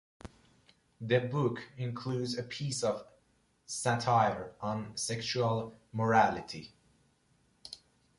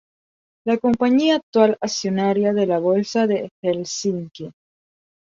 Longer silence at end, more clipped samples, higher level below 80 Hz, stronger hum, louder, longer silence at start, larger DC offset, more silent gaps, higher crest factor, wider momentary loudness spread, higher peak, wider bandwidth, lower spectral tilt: second, 0.45 s vs 0.7 s; neither; about the same, -66 dBFS vs -62 dBFS; neither; second, -32 LUFS vs -20 LUFS; second, 0.25 s vs 0.65 s; neither; second, none vs 1.43-1.53 s, 3.51-3.63 s; about the same, 22 dB vs 18 dB; first, 21 LU vs 12 LU; second, -12 dBFS vs -2 dBFS; first, 11.5 kHz vs 7.8 kHz; about the same, -5 dB/octave vs -5 dB/octave